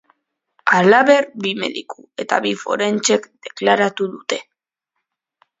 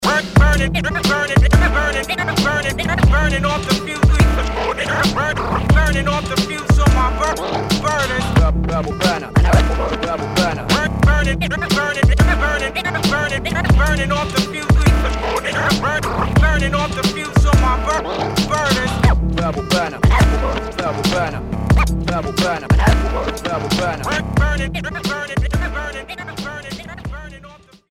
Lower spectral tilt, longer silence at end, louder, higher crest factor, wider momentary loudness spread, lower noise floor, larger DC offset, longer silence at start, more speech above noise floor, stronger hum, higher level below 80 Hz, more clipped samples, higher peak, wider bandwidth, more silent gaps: second, -3.5 dB/octave vs -5.5 dB/octave; first, 1.2 s vs 0.35 s; about the same, -17 LUFS vs -17 LUFS; about the same, 18 dB vs 14 dB; first, 15 LU vs 7 LU; first, -79 dBFS vs -42 dBFS; neither; first, 0.65 s vs 0 s; first, 62 dB vs 23 dB; neither; second, -68 dBFS vs -20 dBFS; neither; about the same, 0 dBFS vs -2 dBFS; second, 7.8 kHz vs 16 kHz; neither